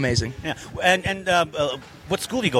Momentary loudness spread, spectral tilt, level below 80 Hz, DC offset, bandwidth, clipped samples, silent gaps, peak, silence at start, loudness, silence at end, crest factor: 11 LU; -4 dB/octave; -46 dBFS; under 0.1%; 16.5 kHz; under 0.1%; none; -4 dBFS; 0 s; -23 LUFS; 0 s; 20 dB